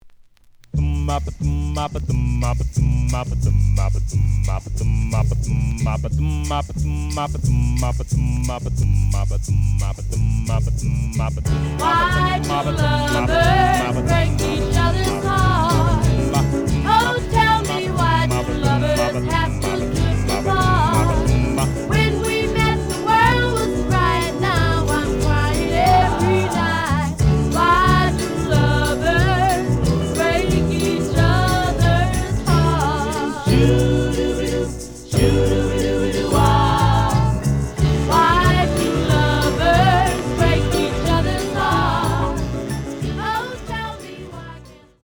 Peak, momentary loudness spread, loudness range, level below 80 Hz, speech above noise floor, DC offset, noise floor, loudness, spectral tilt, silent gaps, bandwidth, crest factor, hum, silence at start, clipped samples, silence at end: -2 dBFS; 7 LU; 4 LU; -26 dBFS; 30 dB; under 0.1%; -48 dBFS; -18 LUFS; -5.5 dB/octave; none; over 20 kHz; 16 dB; none; 0.05 s; under 0.1%; 0.3 s